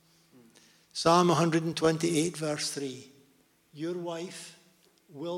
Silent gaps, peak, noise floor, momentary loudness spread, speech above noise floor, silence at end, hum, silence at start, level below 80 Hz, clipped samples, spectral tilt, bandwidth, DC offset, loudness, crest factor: none; -10 dBFS; -66 dBFS; 18 LU; 37 dB; 0 s; none; 0.95 s; -68 dBFS; under 0.1%; -5 dB/octave; 16 kHz; under 0.1%; -28 LUFS; 20 dB